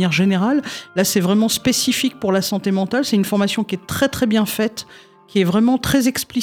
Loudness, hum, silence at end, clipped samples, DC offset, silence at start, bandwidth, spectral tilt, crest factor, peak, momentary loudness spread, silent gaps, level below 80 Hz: -18 LUFS; none; 0 s; under 0.1%; under 0.1%; 0 s; 19.5 kHz; -4.5 dB/octave; 14 dB; -4 dBFS; 6 LU; none; -48 dBFS